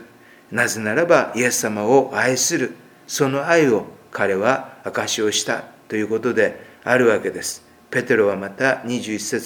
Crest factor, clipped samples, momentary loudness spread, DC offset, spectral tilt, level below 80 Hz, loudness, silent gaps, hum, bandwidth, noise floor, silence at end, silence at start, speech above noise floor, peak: 20 dB; under 0.1%; 11 LU; under 0.1%; -3.5 dB/octave; -66 dBFS; -20 LUFS; none; none; 20 kHz; -47 dBFS; 0 s; 0 s; 27 dB; 0 dBFS